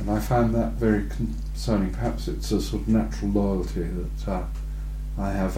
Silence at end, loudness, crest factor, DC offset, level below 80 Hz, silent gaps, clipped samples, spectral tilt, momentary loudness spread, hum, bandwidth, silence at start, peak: 0 s; -26 LUFS; 16 dB; under 0.1%; -30 dBFS; none; under 0.1%; -7 dB/octave; 8 LU; none; 16 kHz; 0 s; -8 dBFS